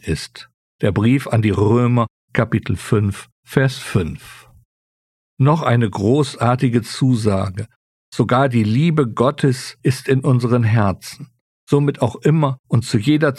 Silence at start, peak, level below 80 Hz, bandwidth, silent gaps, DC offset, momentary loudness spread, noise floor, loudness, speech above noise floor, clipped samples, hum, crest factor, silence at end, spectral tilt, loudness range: 0.05 s; -2 dBFS; -46 dBFS; 13 kHz; 0.54-0.79 s, 2.10-2.28 s, 3.32-3.43 s, 4.65-5.37 s, 7.76-8.12 s, 11.41-11.67 s, 12.59-12.64 s; under 0.1%; 10 LU; under -90 dBFS; -18 LUFS; over 73 dB; under 0.1%; none; 16 dB; 0 s; -7 dB/octave; 3 LU